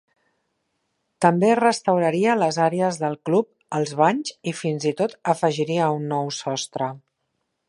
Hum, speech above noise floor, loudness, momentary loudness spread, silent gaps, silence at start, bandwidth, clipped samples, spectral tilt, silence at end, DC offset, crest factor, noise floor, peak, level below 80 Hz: none; 54 dB; -22 LUFS; 9 LU; none; 1.2 s; 11.5 kHz; under 0.1%; -5.5 dB/octave; 0.7 s; under 0.1%; 22 dB; -75 dBFS; -2 dBFS; -72 dBFS